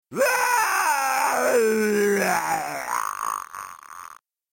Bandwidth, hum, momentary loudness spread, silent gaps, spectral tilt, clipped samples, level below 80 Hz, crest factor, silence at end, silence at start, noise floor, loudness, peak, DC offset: 17 kHz; none; 17 LU; none; -2.5 dB/octave; under 0.1%; -66 dBFS; 16 dB; 0.35 s; 0.1 s; -46 dBFS; -22 LUFS; -8 dBFS; under 0.1%